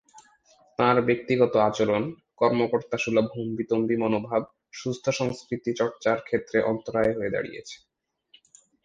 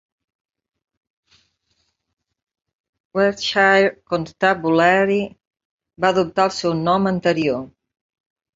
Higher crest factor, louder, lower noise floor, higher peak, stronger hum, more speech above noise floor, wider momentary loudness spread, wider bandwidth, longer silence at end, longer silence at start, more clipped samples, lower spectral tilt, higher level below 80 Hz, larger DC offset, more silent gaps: about the same, 22 dB vs 20 dB; second, -26 LUFS vs -18 LUFS; second, -61 dBFS vs -69 dBFS; about the same, -4 dBFS vs -2 dBFS; neither; second, 36 dB vs 51 dB; about the same, 12 LU vs 11 LU; first, 9.2 kHz vs 7.8 kHz; first, 1.1 s vs 0.9 s; second, 0.15 s vs 3.15 s; neither; about the same, -6 dB/octave vs -5.5 dB/octave; about the same, -60 dBFS vs -58 dBFS; neither; second, none vs 5.47-5.51 s, 5.65-5.78 s